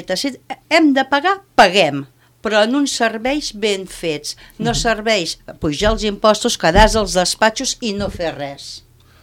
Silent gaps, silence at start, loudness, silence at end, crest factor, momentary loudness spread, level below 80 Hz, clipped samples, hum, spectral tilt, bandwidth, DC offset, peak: none; 0 s; -16 LUFS; 0.45 s; 18 dB; 14 LU; -32 dBFS; under 0.1%; none; -3.5 dB/octave; 17 kHz; under 0.1%; 0 dBFS